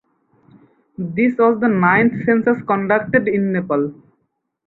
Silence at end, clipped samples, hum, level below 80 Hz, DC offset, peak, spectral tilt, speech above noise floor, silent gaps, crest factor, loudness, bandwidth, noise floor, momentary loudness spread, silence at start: 0.75 s; under 0.1%; none; -56 dBFS; under 0.1%; -2 dBFS; -10.5 dB/octave; 54 dB; none; 16 dB; -17 LUFS; 4.1 kHz; -70 dBFS; 7 LU; 1 s